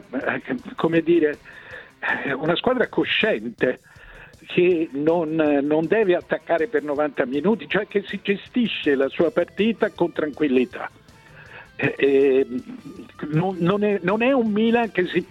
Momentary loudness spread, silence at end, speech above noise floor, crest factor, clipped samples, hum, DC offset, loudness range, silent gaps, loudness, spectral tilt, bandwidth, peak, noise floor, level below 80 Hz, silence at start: 11 LU; 0.05 s; 25 dB; 16 dB; under 0.1%; none; under 0.1%; 2 LU; none; -22 LUFS; -7.5 dB/octave; 8.8 kHz; -6 dBFS; -47 dBFS; -58 dBFS; 0.1 s